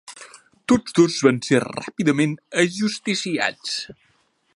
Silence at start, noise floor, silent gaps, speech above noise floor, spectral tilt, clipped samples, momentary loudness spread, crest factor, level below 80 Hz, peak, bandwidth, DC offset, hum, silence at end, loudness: 0.1 s; -64 dBFS; none; 43 dB; -4.5 dB/octave; under 0.1%; 14 LU; 20 dB; -58 dBFS; -2 dBFS; 11.5 kHz; under 0.1%; none; 0.65 s; -21 LUFS